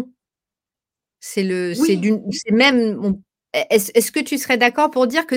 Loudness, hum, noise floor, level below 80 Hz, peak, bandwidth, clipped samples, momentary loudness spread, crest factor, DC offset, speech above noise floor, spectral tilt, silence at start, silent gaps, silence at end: -18 LUFS; none; -89 dBFS; -60 dBFS; 0 dBFS; 17 kHz; under 0.1%; 11 LU; 18 dB; under 0.1%; 71 dB; -4 dB/octave; 0 s; none; 0 s